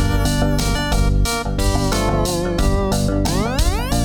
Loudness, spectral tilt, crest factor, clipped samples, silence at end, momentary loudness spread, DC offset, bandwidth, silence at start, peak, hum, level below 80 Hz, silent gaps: -19 LUFS; -5 dB/octave; 12 dB; under 0.1%; 0 s; 2 LU; under 0.1%; 19.5 kHz; 0 s; -6 dBFS; none; -20 dBFS; none